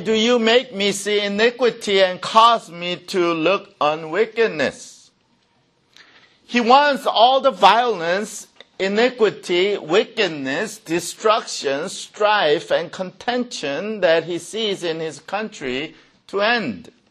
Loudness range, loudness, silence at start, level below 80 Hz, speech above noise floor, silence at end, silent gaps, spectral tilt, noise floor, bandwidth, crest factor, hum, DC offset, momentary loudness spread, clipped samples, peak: 6 LU; -19 LUFS; 0 s; -64 dBFS; 43 dB; 0.3 s; none; -3.5 dB/octave; -62 dBFS; 13.5 kHz; 20 dB; none; under 0.1%; 13 LU; under 0.1%; 0 dBFS